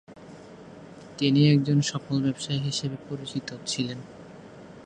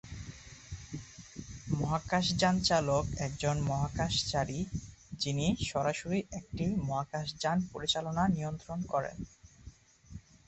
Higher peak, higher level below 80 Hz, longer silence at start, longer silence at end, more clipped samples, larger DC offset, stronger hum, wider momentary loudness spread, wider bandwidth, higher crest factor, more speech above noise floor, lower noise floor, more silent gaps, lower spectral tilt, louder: first, -8 dBFS vs -16 dBFS; second, -64 dBFS vs -50 dBFS; about the same, 0.1 s vs 0.05 s; second, 0 s vs 0.25 s; neither; neither; neither; first, 26 LU vs 19 LU; first, 9.8 kHz vs 8.4 kHz; about the same, 20 dB vs 18 dB; about the same, 20 dB vs 22 dB; second, -46 dBFS vs -55 dBFS; neither; about the same, -5.5 dB/octave vs -5 dB/octave; first, -26 LUFS vs -33 LUFS